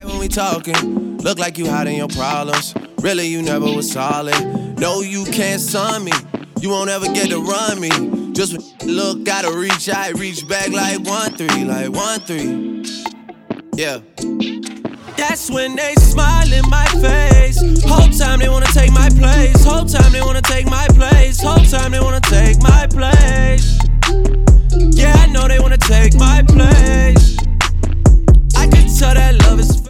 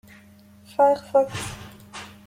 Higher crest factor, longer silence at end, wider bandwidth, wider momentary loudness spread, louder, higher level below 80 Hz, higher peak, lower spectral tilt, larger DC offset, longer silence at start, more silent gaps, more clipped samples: second, 12 dB vs 18 dB; second, 0 s vs 0.2 s; about the same, 15.5 kHz vs 15.5 kHz; second, 11 LU vs 20 LU; first, -14 LUFS vs -22 LUFS; first, -12 dBFS vs -56 dBFS; first, 0 dBFS vs -8 dBFS; about the same, -5 dB/octave vs -4.5 dB/octave; neither; second, 0.05 s vs 0.8 s; neither; neither